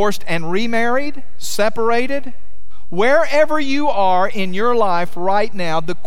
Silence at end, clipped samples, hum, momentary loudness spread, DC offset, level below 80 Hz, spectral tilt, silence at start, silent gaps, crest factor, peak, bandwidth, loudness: 0.1 s; under 0.1%; none; 9 LU; 20%; -50 dBFS; -4.5 dB/octave; 0 s; none; 16 dB; -2 dBFS; 16.5 kHz; -18 LUFS